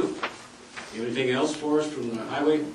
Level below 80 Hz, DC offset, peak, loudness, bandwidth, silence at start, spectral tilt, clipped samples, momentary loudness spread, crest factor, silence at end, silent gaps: -66 dBFS; under 0.1%; -12 dBFS; -27 LUFS; 11.5 kHz; 0 s; -4.5 dB/octave; under 0.1%; 15 LU; 16 dB; 0 s; none